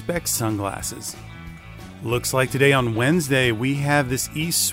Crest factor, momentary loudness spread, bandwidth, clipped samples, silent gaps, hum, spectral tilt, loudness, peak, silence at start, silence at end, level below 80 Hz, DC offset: 18 dB; 21 LU; 16 kHz; under 0.1%; none; none; -4 dB/octave; -21 LUFS; -4 dBFS; 0 s; 0 s; -46 dBFS; under 0.1%